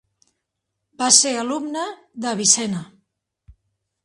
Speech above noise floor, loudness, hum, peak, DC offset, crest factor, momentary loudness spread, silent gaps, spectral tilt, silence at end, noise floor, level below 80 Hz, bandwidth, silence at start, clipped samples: 59 dB; -18 LUFS; none; 0 dBFS; under 0.1%; 24 dB; 16 LU; none; -1.5 dB/octave; 1.2 s; -79 dBFS; -62 dBFS; 14 kHz; 1 s; under 0.1%